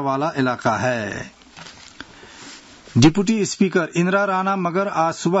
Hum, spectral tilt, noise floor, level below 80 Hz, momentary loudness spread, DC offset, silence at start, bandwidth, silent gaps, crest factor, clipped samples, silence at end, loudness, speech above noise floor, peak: none; -5.5 dB/octave; -42 dBFS; -50 dBFS; 24 LU; under 0.1%; 0 s; 8 kHz; none; 18 dB; under 0.1%; 0 s; -19 LUFS; 23 dB; -2 dBFS